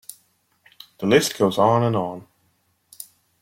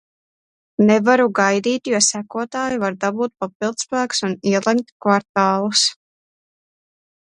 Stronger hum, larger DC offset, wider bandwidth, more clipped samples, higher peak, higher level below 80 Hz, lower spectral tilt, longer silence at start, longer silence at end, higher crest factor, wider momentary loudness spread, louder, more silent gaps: neither; neither; first, 16.5 kHz vs 11.5 kHz; neither; about the same, -2 dBFS vs 0 dBFS; about the same, -60 dBFS vs -64 dBFS; first, -5 dB/octave vs -3.5 dB/octave; first, 1 s vs 0.8 s; second, 0.4 s vs 1.3 s; about the same, 20 dB vs 20 dB; first, 23 LU vs 9 LU; about the same, -20 LUFS vs -18 LUFS; second, none vs 3.55-3.60 s, 4.92-5.00 s, 5.29-5.34 s